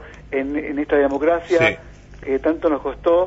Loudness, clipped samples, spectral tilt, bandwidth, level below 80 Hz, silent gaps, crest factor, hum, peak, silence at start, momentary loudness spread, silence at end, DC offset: -20 LUFS; under 0.1%; -6 dB/octave; 8 kHz; -42 dBFS; none; 16 dB; 50 Hz at -45 dBFS; -4 dBFS; 0 s; 9 LU; 0 s; under 0.1%